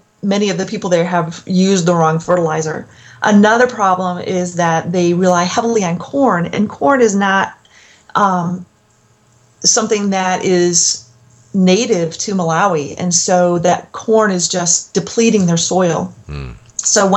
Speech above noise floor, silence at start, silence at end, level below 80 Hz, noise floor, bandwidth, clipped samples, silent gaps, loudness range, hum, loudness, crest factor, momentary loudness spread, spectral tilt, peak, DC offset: 39 dB; 0.25 s; 0 s; -48 dBFS; -53 dBFS; 9.2 kHz; under 0.1%; none; 2 LU; none; -14 LUFS; 14 dB; 8 LU; -4 dB/octave; 0 dBFS; under 0.1%